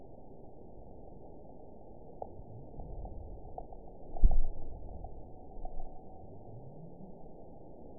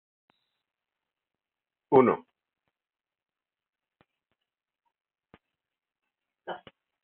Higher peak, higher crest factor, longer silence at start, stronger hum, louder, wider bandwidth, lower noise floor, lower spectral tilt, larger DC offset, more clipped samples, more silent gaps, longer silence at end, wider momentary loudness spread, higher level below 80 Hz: about the same, -10 dBFS vs -8 dBFS; about the same, 24 dB vs 26 dB; second, 0.4 s vs 1.9 s; neither; second, -45 LUFS vs -24 LUFS; second, 1 kHz vs 3.9 kHz; second, -52 dBFS vs under -90 dBFS; first, -14 dB/octave vs -6.5 dB/octave; first, 0.3% vs under 0.1%; neither; neither; second, 0.1 s vs 0.5 s; second, 16 LU vs 22 LU; first, -38 dBFS vs -78 dBFS